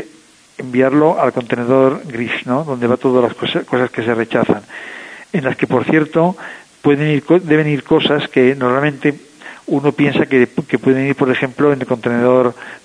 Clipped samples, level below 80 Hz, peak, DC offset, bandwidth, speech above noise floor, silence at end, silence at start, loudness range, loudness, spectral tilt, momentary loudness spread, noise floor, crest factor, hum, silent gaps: under 0.1%; -58 dBFS; 0 dBFS; under 0.1%; 10.5 kHz; 31 dB; 0.1 s; 0 s; 3 LU; -15 LUFS; -7 dB/octave; 8 LU; -46 dBFS; 14 dB; none; none